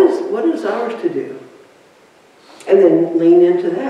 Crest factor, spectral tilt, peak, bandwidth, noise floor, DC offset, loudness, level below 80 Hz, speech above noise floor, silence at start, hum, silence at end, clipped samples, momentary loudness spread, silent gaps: 14 dB; -7.5 dB/octave; -2 dBFS; 9 kHz; -48 dBFS; under 0.1%; -14 LUFS; -68 dBFS; 36 dB; 0 s; none; 0 s; under 0.1%; 17 LU; none